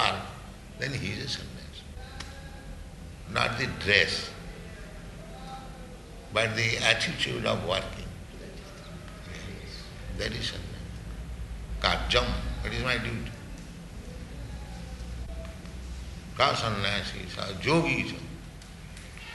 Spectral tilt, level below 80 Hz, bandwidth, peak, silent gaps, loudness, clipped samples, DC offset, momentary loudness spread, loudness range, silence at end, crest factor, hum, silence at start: -4 dB/octave; -42 dBFS; 12 kHz; -4 dBFS; none; -29 LUFS; under 0.1%; under 0.1%; 19 LU; 9 LU; 0 s; 28 dB; none; 0 s